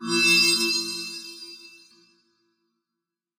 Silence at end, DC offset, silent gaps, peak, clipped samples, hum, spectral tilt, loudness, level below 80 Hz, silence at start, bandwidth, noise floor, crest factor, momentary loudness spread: 1.7 s; under 0.1%; none; -8 dBFS; under 0.1%; none; -1 dB/octave; -19 LUFS; -82 dBFS; 0 s; 16.5 kHz; -86 dBFS; 20 dB; 23 LU